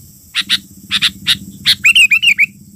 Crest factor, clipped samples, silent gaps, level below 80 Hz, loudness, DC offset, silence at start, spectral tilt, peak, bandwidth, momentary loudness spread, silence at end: 12 dB; under 0.1%; none; -48 dBFS; -11 LUFS; under 0.1%; 0.35 s; 1 dB/octave; -2 dBFS; 16 kHz; 11 LU; 0.3 s